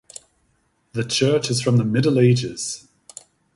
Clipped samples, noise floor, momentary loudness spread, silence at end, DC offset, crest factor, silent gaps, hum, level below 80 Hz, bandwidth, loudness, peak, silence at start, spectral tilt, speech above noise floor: under 0.1%; -65 dBFS; 24 LU; 0.75 s; under 0.1%; 18 dB; none; none; -58 dBFS; 11.5 kHz; -20 LUFS; -4 dBFS; 0.95 s; -5.5 dB/octave; 47 dB